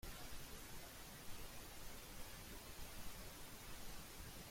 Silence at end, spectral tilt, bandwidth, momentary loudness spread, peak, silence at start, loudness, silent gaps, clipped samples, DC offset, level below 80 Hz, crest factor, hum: 0 s; -3 dB/octave; 16.5 kHz; 1 LU; -38 dBFS; 0.05 s; -55 LUFS; none; under 0.1%; under 0.1%; -58 dBFS; 14 dB; none